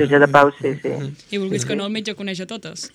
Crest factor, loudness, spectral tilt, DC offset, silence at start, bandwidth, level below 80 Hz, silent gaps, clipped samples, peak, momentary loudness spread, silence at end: 20 dB; -19 LUFS; -5 dB/octave; under 0.1%; 0 s; 13 kHz; -60 dBFS; none; under 0.1%; 0 dBFS; 16 LU; 0.1 s